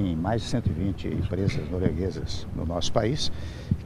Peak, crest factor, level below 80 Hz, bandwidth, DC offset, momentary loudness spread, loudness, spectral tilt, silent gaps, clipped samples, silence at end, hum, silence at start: -6 dBFS; 20 dB; -40 dBFS; 12.5 kHz; under 0.1%; 6 LU; -28 LUFS; -6 dB/octave; none; under 0.1%; 0 s; none; 0 s